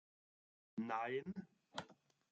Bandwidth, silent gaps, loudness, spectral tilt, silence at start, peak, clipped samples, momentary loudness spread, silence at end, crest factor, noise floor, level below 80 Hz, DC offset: 7.6 kHz; none; -47 LUFS; -4 dB/octave; 0.75 s; -28 dBFS; under 0.1%; 11 LU; 0.4 s; 20 dB; -67 dBFS; -86 dBFS; under 0.1%